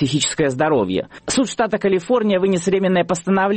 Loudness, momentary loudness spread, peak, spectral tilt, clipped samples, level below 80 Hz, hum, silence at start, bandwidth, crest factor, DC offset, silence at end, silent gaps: -18 LUFS; 3 LU; -6 dBFS; -4.5 dB/octave; under 0.1%; -52 dBFS; none; 0 s; 8.8 kHz; 12 dB; under 0.1%; 0 s; none